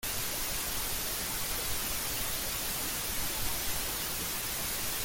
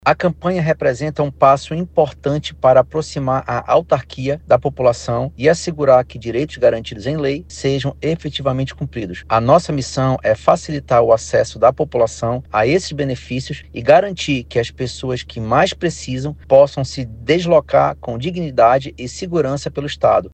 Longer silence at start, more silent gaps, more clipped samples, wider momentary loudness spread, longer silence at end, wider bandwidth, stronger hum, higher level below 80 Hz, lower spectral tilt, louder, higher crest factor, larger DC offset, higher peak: about the same, 0 s vs 0.05 s; neither; neither; second, 1 LU vs 11 LU; about the same, 0 s vs 0.05 s; first, 17 kHz vs 9 kHz; neither; second, -46 dBFS vs -40 dBFS; second, -1 dB/octave vs -6 dB/octave; second, -32 LUFS vs -17 LUFS; about the same, 14 dB vs 16 dB; neither; second, -20 dBFS vs 0 dBFS